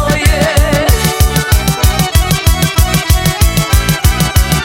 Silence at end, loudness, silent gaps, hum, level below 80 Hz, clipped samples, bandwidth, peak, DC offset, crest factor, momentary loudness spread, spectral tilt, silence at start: 0 s; -11 LUFS; none; none; -14 dBFS; 0.2%; 17 kHz; 0 dBFS; under 0.1%; 10 dB; 1 LU; -4.5 dB/octave; 0 s